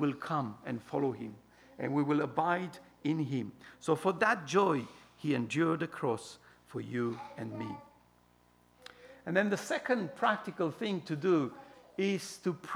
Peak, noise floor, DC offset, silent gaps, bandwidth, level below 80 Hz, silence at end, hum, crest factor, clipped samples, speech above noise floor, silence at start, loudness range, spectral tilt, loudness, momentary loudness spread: -14 dBFS; -66 dBFS; under 0.1%; none; over 20 kHz; -76 dBFS; 0 s; 60 Hz at -60 dBFS; 20 dB; under 0.1%; 33 dB; 0 s; 6 LU; -6 dB/octave; -34 LUFS; 15 LU